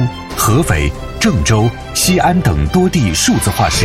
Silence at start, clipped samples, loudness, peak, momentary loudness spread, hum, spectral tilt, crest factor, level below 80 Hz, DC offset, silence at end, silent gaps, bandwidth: 0 s; under 0.1%; -13 LUFS; -2 dBFS; 5 LU; none; -4.5 dB/octave; 12 dB; -26 dBFS; under 0.1%; 0 s; none; 16.5 kHz